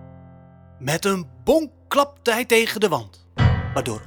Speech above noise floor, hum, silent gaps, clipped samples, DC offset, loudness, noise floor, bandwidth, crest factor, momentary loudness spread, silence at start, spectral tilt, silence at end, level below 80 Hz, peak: 25 dB; none; none; under 0.1%; under 0.1%; -21 LUFS; -46 dBFS; over 20 kHz; 18 dB; 8 LU; 0 s; -5 dB/octave; 0 s; -38 dBFS; -4 dBFS